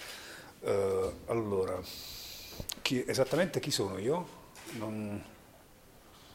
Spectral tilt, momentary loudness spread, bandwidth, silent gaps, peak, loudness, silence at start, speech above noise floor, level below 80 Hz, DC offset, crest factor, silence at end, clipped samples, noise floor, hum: -4.5 dB/octave; 14 LU; 16.5 kHz; none; -14 dBFS; -34 LUFS; 0 s; 24 dB; -60 dBFS; under 0.1%; 22 dB; 0 s; under 0.1%; -58 dBFS; none